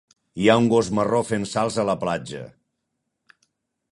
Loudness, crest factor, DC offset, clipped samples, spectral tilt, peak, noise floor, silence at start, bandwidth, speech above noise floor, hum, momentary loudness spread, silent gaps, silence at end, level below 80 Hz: -21 LUFS; 22 dB; under 0.1%; under 0.1%; -5.5 dB/octave; -2 dBFS; -78 dBFS; 0.35 s; 11.5 kHz; 57 dB; none; 19 LU; none; 1.45 s; -56 dBFS